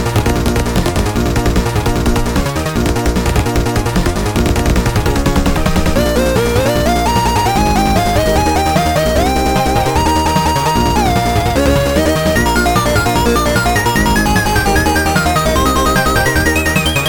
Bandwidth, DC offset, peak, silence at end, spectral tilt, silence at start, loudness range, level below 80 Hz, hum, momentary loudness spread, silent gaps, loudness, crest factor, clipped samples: 19.5 kHz; under 0.1%; 0 dBFS; 0 s; -5 dB/octave; 0 s; 3 LU; -20 dBFS; none; 3 LU; none; -13 LUFS; 12 dB; under 0.1%